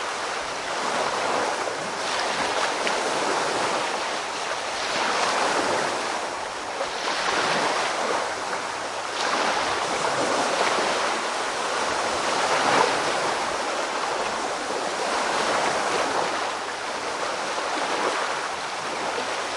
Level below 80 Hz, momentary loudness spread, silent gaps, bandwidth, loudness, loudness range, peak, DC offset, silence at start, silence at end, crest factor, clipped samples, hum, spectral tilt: -62 dBFS; 6 LU; none; 11.5 kHz; -25 LUFS; 2 LU; -6 dBFS; under 0.1%; 0 s; 0 s; 20 dB; under 0.1%; none; -1.5 dB/octave